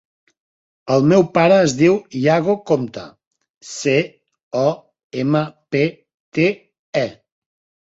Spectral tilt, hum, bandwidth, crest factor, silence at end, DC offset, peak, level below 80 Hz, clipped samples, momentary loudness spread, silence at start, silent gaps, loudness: -6 dB/octave; none; 8 kHz; 18 dB; 0.7 s; under 0.1%; -2 dBFS; -60 dBFS; under 0.1%; 16 LU; 0.85 s; 3.27-3.31 s, 3.50-3.61 s, 4.43-4.51 s, 5.04-5.10 s, 6.14-6.32 s, 6.79-6.93 s; -18 LUFS